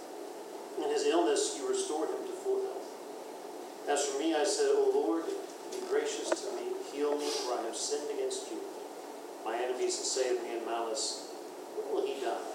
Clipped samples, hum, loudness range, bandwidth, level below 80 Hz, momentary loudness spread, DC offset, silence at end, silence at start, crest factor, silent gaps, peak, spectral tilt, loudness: under 0.1%; none; 3 LU; 16 kHz; under -90 dBFS; 15 LU; under 0.1%; 0 s; 0 s; 20 dB; none; -14 dBFS; -1 dB/octave; -33 LUFS